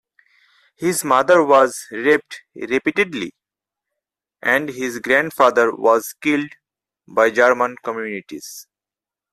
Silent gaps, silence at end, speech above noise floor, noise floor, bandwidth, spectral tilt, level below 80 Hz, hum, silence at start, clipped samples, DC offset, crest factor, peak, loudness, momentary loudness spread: none; 0.7 s; 71 dB; -89 dBFS; 15 kHz; -4 dB/octave; -64 dBFS; none; 0.8 s; under 0.1%; under 0.1%; 18 dB; -2 dBFS; -18 LUFS; 17 LU